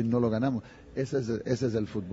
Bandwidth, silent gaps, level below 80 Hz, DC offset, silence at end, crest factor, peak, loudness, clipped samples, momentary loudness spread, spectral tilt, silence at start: 8 kHz; none; -56 dBFS; under 0.1%; 0 s; 16 dB; -14 dBFS; -30 LUFS; under 0.1%; 9 LU; -7.5 dB/octave; 0 s